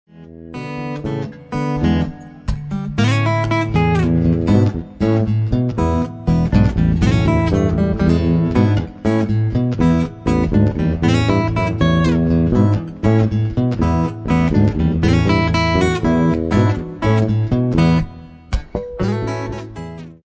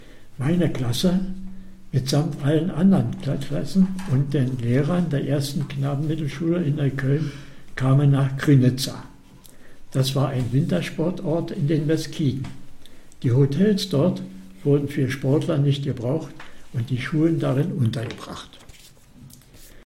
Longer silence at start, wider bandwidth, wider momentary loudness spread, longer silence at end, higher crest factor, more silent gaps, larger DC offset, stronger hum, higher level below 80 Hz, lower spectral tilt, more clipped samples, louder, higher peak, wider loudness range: first, 0.15 s vs 0 s; second, 8 kHz vs 15 kHz; about the same, 11 LU vs 13 LU; about the same, 0.1 s vs 0.05 s; about the same, 14 dB vs 16 dB; neither; neither; neither; first, -28 dBFS vs -44 dBFS; about the same, -8 dB/octave vs -7 dB/octave; neither; first, -17 LUFS vs -23 LUFS; first, -2 dBFS vs -6 dBFS; about the same, 3 LU vs 3 LU